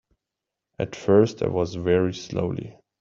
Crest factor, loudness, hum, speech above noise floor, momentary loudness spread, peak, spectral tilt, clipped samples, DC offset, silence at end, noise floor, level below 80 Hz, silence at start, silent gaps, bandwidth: 20 dB; -24 LUFS; none; 63 dB; 13 LU; -4 dBFS; -7 dB/octave; under 0.1%; under 0.1%; 0.3 s; -86 dBFS; -54 dBFS; 0.8 s; none; 7.6 kHz